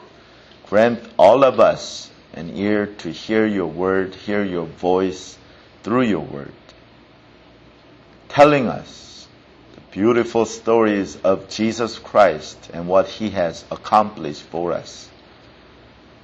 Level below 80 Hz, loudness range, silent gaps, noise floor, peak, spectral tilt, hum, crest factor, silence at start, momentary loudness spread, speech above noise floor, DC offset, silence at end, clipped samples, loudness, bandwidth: -54 dBFS; 6 LU; none; -48 dBFS; -2 dBFS; -5.5 dB/octave; none; 18 dB; 0.7 s; 21 LU; 30 dB; under 0.1%; 1.2 s; under 0.1%; -19 LUFS; 8.4 kHz